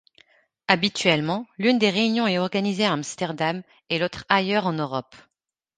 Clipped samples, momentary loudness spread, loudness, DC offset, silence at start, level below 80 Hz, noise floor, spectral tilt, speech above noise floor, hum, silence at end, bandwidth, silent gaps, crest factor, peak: under 0.1%; 9 LU; -23 LUFS; under 0.1%; 0.7 s; -64 dBFS; -59 dBFS; -4.5 dB/octave; 36 dB; none; 0.75 s; 9.8 kHz; none; 24 dB; 0 dBFS